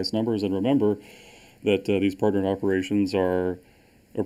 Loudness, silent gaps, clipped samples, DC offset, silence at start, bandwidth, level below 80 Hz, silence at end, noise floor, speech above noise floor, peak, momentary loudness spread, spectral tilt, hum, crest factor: -25 LUFS; none; under 0.1%; under 0.1%; 0 s; 13 kHz; -60 dBFS; 0 s; -47 dBFS; 23 dB; -8 dBFS; 8 LU; -7 dB/octave; none; 18 dB